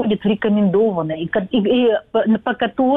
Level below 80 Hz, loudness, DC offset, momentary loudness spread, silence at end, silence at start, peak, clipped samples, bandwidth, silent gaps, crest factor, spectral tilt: -52 dBFS; -18 LUFS; under 0.1%; 5 LU; 0 s; 0 s; -8 dBFS; under 0.1%; 3.9 kHz; none; 10 dB; -9.5 dB/octave